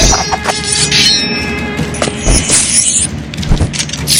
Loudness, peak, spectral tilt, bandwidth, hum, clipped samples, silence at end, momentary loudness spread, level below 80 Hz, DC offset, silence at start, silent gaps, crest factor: -11 LUFS; 0 dBFS; -2 dB/octave; over 20 kHz; none; 0.2%; 0 s; 10 LU; -20 dBFS; under 0.1%; 0 s; none; 12 dB